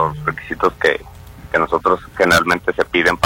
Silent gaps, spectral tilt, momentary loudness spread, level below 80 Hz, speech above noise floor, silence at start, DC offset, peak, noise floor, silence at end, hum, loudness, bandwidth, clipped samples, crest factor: none; -4 dB/octave; 8 LU; -40 dBFS; 21 dB; 0 s; under 0.1%; 0 dBFS; -37 dBFS; 0 s; none; -17 LUFS; 16.5 kHz; under 0.1%; 16 dB